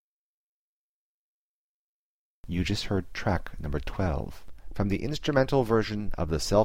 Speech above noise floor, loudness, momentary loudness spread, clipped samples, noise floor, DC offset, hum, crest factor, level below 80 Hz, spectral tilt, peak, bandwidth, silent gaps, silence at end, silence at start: over 63 dB; -29 LUFS; 11 LU; under 0.1%; under -90 dBFS; under 0.1%; none; 20 dB; -40 dBFS; -6 dB/octave; -8 dBFS; 16 kHz; none; 0 s; 0.05 s